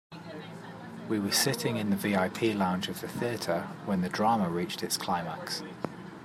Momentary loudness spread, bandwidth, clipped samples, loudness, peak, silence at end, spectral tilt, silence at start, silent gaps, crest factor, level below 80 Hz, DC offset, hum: 16 LU; 16 kHz; under 0.1%; -30 LUFS; -12 dBFS; 0 s; -4.5 dB/octave; 0.1 s; none; 18 dB; -70 dBFS; under 0.1%; none